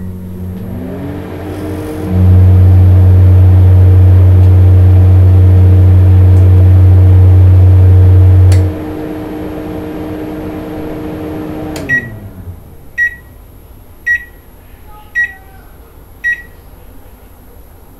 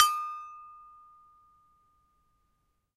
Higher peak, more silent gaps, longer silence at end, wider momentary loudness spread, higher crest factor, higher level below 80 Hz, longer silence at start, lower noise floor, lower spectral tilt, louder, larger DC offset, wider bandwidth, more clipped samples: first, 0 dBFS vs -4 dBFS; neither; second, 1.55 s vs 2.2 s; second, 16 LU vs 25 LU; second, 8 dB vs 30 dB; first, -32 dBFS vs -76 dBFS; about the same, 0 s vs 0 s; second, -35 dBFS vs -75 dBFS; first, -9 dB/octave vs 4 dB/octave; first, -7 LUFS vs -31 LUFS; neither; second, 3.4 kHz vs 16 kHz; first, 1% vs under 0.1%